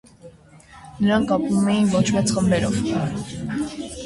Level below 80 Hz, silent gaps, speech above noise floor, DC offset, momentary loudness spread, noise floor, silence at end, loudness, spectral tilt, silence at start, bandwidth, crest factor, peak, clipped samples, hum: -46 dBFS; none; 27 dB; under 0.1%; 9 LU; -47 dBFS; 0 s; -21 LUFS; -5.5 dB/octave; 0.25 s; 11.5 kHz; 16 dB; -6 dBFS; under 0.1%; none